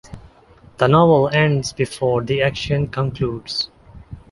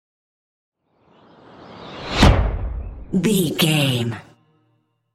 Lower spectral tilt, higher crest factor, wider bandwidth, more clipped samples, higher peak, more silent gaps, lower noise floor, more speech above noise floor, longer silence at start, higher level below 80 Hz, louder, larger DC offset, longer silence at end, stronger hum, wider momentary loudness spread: about the same, -6 dB/octave vs -5 dB/octave; about the same, 18 dB vs 20 dB; second, 11.5 kHz vs 16 kHz; neither; about the same, -2 dBFS vs -2 dBFS; neither; second, -48 dBFS vs -66 dBFS; second, 30 dB vs 47 dB; second, 0.1 s vs 1.6 s; second, -44 dBFS vs -28 dBFS; about the same, -18 LUFS vs -19 LUFS; neither; second, 0.15 s vs 0.95 s; neither; second, 10 LU vs 19 LU